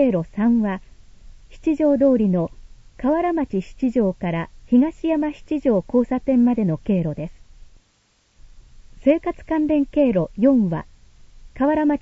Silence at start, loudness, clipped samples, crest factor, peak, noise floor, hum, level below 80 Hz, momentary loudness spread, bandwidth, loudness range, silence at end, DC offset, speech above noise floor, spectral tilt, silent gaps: 0 s; -20 LUFS; under 0.1%; 16 dB; -4 dBFS; -62 dBFS; none; -44 dBFS; 9 LU; 7.6 kHz; 3 LU; 0.05 s; under 0.1%; 43 dB; -9.5 dB/octave; none